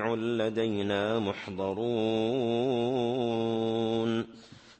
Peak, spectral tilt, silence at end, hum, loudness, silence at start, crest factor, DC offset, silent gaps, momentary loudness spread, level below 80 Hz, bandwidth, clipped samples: -16 dBFS; -7 dB/octave; 0.05 s; none; -30 LUFS; 0 s; 14 dB; under 0.1%; none; 5 LU; -68 dBFS; 8.6 kHz; under 0.1%